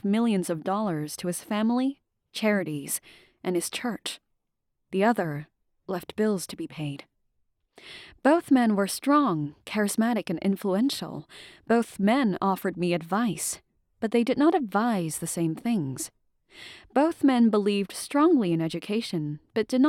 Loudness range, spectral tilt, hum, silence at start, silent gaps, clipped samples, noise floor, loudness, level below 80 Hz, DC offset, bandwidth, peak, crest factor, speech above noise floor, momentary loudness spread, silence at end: 5 LU; -5 dB/octave; none; 0.05 s; none; under 0.1%; -79 dBFS; -26 LUFS; -68 dBFS; under 0.1%; 17 kHz; -8 dBFS; 18 dB; 53 dB; 14 LU; 0 s